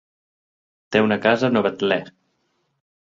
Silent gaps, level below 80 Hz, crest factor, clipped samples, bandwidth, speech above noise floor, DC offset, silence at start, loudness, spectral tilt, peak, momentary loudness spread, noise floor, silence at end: none; -64 dBFS; 20 dB; under 0.1%; 7.6 kHz; 51 dB; under 0.1%; 0.9 s; -20 LUFS; -6 dB/octave; -2 dBFS; 5 LU; -70 dBFS; 1.05 s